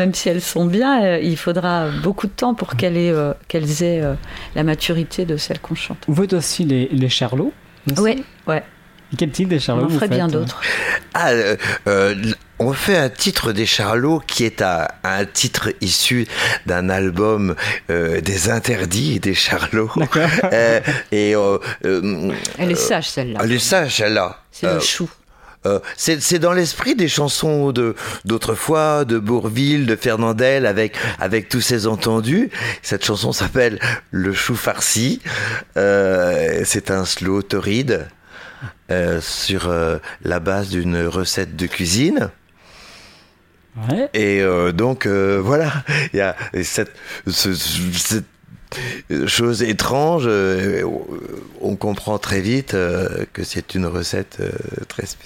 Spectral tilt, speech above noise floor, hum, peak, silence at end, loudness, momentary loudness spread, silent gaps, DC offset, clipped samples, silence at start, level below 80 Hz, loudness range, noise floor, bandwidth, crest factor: -4.5 dB/octave; 35 dB; none; 0 dBFS; 0.1 s; -18 LUFS; 8 LU; none; under 0.1%; under 0.1%; 0 s; -44 dBFS; 3 LU; -53 dBFS; 16.5 kHz; 18 dB